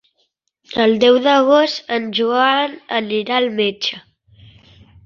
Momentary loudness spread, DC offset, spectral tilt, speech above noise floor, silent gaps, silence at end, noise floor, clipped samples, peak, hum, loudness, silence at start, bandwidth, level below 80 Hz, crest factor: 10 LU; under 0.1%; -4.5 dB/octave; 51 dB; none; 1.05 s; -67 dBFS; under 0.1%; -2 dBFS; none; -16 LUFS; 0.7 s; 7.2 kHz; -60 dBFS; 16 dB